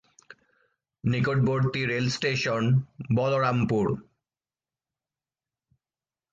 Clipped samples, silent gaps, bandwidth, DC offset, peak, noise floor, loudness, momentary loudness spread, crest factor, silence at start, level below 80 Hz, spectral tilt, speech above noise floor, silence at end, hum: under 0.1%; none; 7.6 kHz; under 0.1%; -12 dBFS; under -90 dBFS; -26 LUFS; 5 LU; 16 dB; 1.05 s; -58 dBFS; -6.5 dB/octave; over 65 dB; 2.3 s; none